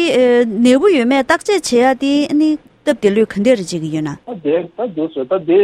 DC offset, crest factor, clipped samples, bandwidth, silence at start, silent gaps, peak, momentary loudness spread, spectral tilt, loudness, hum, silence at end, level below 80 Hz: under 0.1%; 14 dB; under 0.1%; 14 kHz; 0 s; none; 0 dBFS; 10 LU; -5 dB/octave; -15 LUFS; none; 0 s; -54 dBFS